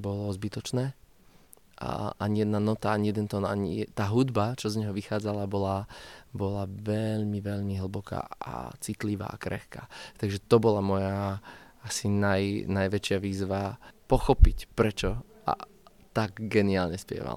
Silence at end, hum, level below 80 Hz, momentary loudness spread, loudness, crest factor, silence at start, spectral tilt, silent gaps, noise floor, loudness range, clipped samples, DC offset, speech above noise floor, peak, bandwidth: 0 s; none; -36 dBFS; 12 LU; -30 LUFS; 26 dB; 0 s; -6.5 dB/octave; none; -58 dBFS; 5 LU; under 0.1%; under 0.1%; 30 dB; -4 dBFS; 15.5 kHz